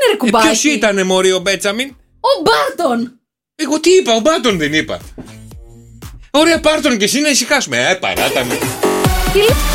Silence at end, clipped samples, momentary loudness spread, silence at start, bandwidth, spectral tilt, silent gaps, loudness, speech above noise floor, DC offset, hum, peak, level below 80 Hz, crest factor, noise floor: 0 s; under 0.1%; 9 LU; 0 s; 17 kHz; -3.5 dB/octave; none; -13 LUFS; 23 dB; under 0.1%; none; 0 dBFS; -30 dBFS; 14 dB; -36 dBFS